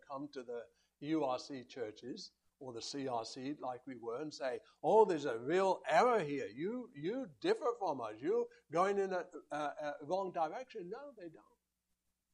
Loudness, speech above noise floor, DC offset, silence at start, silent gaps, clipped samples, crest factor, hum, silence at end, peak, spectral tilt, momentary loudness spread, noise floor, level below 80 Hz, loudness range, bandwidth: -38 LUFS; 49 dB; under 0.1%; 0.1 s; none; under 0.1%; 22 dB; none; 0.95 s; -16 dBFS; -5 dB/octave; 17 LU; -86 dBFS; -84 dBFS; 9 LU; 10.5 kHz